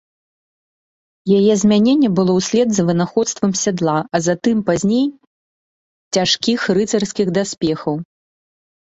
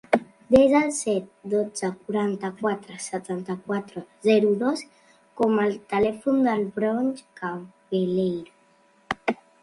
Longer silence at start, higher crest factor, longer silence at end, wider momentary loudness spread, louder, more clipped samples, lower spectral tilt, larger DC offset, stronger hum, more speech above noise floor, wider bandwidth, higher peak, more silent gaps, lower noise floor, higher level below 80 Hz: first, 1.25 s vs 0.1 s; second, 14 dB vs 22 dB; first, 0.8 s vs 0.3 s; second, 7 LU vs 13 LU; first, -17 LUFS vs -25 LUFS; neither; about the same, -5 dB/octave vs -5.5 dB/octave; neither; neither; first, over 74 dB vs 36 dB; second, 8.2 kHz vs 11.5 kHz; about the same, -2 dBFS vs -2 dBFS; first, 5.27-6.11 s vs none; first, under -90 dBFS vs -60 dBFS; first, -54 dBFS vs -60 dBFS